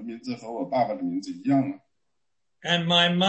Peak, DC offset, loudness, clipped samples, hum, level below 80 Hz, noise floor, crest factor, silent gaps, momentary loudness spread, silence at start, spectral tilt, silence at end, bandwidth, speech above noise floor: -8 dBFS; under 0.1%; -25 LUFS; under 0.1%; none; -72 dBFS; -83 dBFS; 18 dB; none; 15 LU; 0 s; -5 dB/octave; 0 s; 8.4 kHz; 59 dB